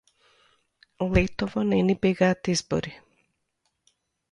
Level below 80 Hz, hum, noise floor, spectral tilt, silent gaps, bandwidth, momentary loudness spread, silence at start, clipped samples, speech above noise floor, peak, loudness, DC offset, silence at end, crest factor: -42 dBFS; none; -76 dBFS; -5.5 dB/octave; none; 11 kHz; 8 LU; 1 s; under 0.1%; 52 dB; -8 dBFS; -25 LUFS; under 0.1%; 1.35 s; 20 dB